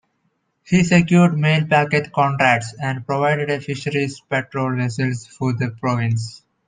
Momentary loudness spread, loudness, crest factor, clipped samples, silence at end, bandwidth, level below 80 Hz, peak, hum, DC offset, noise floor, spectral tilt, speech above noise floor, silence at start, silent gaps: 9 LU; -19 LUFS; 18 dB; under 0.1%; 0.3 s; 9.6 kHz; -56 dBFS; -2 dBFS; none; under 0.1%; -68 dBFS; -6.5 dB/octave; 50 dB; 0.7 s; none